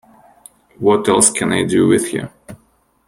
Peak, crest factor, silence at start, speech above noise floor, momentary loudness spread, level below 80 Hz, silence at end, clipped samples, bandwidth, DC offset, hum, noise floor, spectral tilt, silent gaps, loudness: 0 dBFS; 18 dB; 0.8 s; 43 dB; 12 LU; -54 dBFS; 0.55 s; under 0.1%; 16.5 kHz; under 0.1%; none; -58 dBFS; -4 dB/octave; none; -14 LUFS